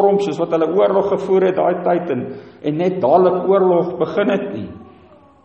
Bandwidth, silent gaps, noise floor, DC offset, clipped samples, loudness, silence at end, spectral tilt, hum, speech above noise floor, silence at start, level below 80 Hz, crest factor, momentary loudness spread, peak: 8 kHz; none; -46 dBFS; under 0.1%; under 0.1%; -17 LUFS; 0.55 s; -8 dB/octave; none; 30 dB; 0 s; -58 dBFS; 16 dB; 11 LU; -2 dBFS